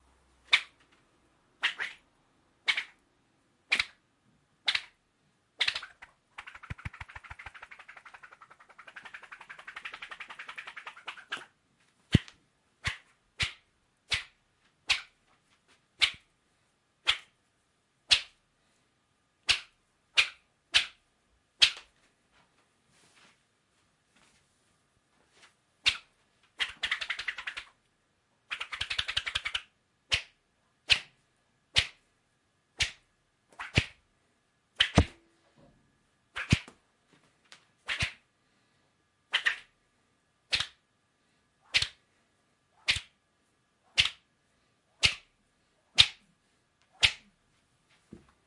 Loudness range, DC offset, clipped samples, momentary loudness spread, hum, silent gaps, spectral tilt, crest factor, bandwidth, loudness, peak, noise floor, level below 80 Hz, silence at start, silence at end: 9 LU; under 0.1%; under 0.1%; 21 LU; none; none; -2.5 dB/octave; 34 dB; 11.5 kHz; -30 LUFS; -2 dBFS; -74 dBFS; -54 dBFS; 0.5 s; 1.3 s